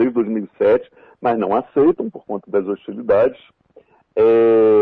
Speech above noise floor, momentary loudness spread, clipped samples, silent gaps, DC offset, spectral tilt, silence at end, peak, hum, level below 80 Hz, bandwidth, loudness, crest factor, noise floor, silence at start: 35 dB; 13 LU; under 0.1%; none; under 0.1%; -9.5 dB/octave; 0 s; -6 dBFS; none; -56 dBFS; 4.2 kHz; -18 LUFS; 12 dB; -51 dBFS; 0 s